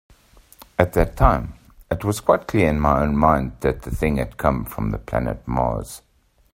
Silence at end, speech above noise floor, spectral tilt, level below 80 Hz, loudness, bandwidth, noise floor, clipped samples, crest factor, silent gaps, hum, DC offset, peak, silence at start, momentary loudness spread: 0.55 s; 31 dB; -7 dB/octave; -30 dBFS; -21 LUFS; 16 kHz; -51 dBFS; under 0.1%; 22 dB; none; none; under 0.1%; 0 dBFS; 0.8 s; 10 LU